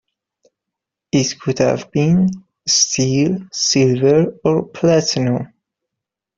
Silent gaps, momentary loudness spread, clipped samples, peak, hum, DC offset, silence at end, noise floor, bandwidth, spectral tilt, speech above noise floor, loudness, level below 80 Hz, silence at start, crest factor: none; 7 LU; under 0.1%; -2 dBFS; none; under 0.1%; 0.9 s; -83 dBFS; 7.6 kHz; -4.5 dB/octave; 67 dB; -16 LUFS; -52 dBFS; 1.15 s; 14 dB